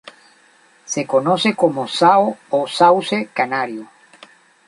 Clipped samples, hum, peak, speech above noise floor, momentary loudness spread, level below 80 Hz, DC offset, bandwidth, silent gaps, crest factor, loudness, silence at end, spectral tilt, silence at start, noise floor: under 0.1%; none; 0 dBFS; 36 dB; 11 LU; -68 dBFS; under 0.1%; 11 kHz; none; 18 dB; -17 LUFS; 0.8 s; -4 dB/octave; 0.05 s; -53 dBFS